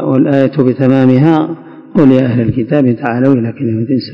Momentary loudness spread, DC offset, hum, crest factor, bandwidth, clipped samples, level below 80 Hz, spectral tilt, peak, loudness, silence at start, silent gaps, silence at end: 8 LU; under 0.1%; none; 10 dB; 5.4 kHz; 2%; -46 dBFS; -10 dB/octave; 0 dBFS; -11 LUFS; 0 s; none; 0 s